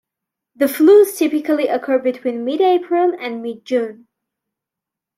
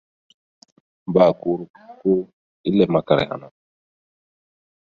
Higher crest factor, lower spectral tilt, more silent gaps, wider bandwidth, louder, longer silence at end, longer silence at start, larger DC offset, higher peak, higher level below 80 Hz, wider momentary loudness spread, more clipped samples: second, 16 dB vs 22 dB; second, -4 dB/octave vs -8.5 dB/octave; second, none vs 1.70-1.74 s, 2.33-2.64 s; first, 16 kHz vs 6.8 kHz; first, -16 LUFS vs -20 LUFS; second, 1.25 s vs 1.4 s; second, 0.6 s vs 1.1 s; neither; about the same, -2 dBFS vs 0 dBFS; second, -70 dBFS vs -56 dBFS; second, 13 LU vs 19 LU; neither